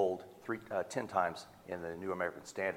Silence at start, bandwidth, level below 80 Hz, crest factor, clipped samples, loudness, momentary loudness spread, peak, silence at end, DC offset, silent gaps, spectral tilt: 0 s; 17 kHz; -72 dBFS; 20 dB; under 0.1%; -38 LUFS; 9 LU; -18 dBFS; 0 s; under 0.1%; none; -5 dB/octave